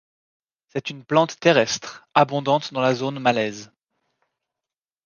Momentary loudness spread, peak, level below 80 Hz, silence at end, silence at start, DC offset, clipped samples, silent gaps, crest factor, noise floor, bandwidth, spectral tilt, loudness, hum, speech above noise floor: 12 LU; -2 dBFS; -68 dBFS; 1.4 s; 0.75 s; under 0.1%; under 0.1%; none; 22 dB; -89 dBFS; 10 kHz; -4.5 dB/octave; -21 LUFS; none; 68 dB